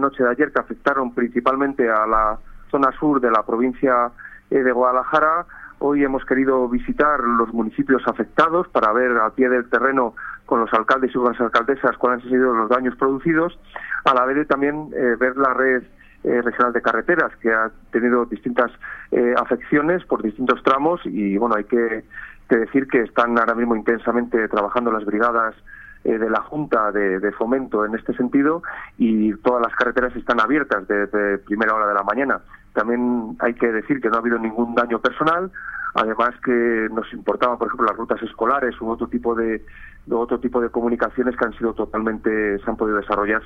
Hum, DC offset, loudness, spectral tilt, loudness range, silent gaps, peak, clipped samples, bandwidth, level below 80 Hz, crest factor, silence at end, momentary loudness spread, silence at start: none; under 0.1%; -20 LUFS; -7.5 dB/octave; 3 LU; none; 0 dBFS; under 0.1%; 6.8 kHz; -46 dBFS; 20 dB; 0 s; 6 LU; 0 s